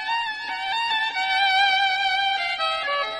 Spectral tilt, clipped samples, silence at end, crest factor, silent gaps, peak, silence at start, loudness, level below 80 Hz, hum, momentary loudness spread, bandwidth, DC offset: 0.5 dB/octave; under 0.1%; 0 s; 14 dB; none; -10 dBFS; 0 s; -21 LUFS; -62 dBFS; none; 8 LU; 12 kHz; under 0.1%